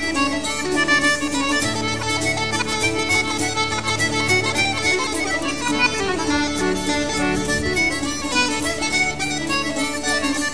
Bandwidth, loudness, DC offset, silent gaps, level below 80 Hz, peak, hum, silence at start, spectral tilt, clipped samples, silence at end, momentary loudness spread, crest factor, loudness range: 11 kHz; -19 LUFS; 2%; none; -42 dBFS; -4 dBFS; none; 0 s; -3 dB/octave; under 0.1%; 0 s; 4 LU; 16 dB; 1 LU